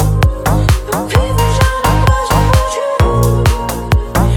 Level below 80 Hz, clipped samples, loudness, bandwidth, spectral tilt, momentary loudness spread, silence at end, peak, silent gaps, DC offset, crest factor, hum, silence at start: -16 dBFS; under 0.1%; -13 LUFS; 19.5 kHz; -5.5 dB/octave; 4 LU; 0 s; 0 dBFS; none; under 0.1%; 12 dB; none; 0 s